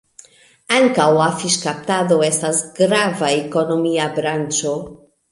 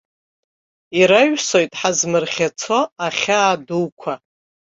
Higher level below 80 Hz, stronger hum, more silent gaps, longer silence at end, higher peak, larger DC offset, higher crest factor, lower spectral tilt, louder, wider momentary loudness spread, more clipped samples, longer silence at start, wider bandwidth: about the same, -60 dBFS vs -62 dBFS; neither; second, none vs 2.92-2.96 s, 3.92-3.97 s; second, 0.35 s vs 0.55 s; about the same, -2 dBFS vs 0 dBFS; neither; about the same, 18 dB vs 18 dB; about the same, -3.5 dB/octave vs -3 dB/octave; about the same, -17 LUFS vs -17 LUFS; second, 6 LU vs 11 LU; neither; second, 0.7 s vs 0.9 s; first, 11.5 kHz vs 8 kHz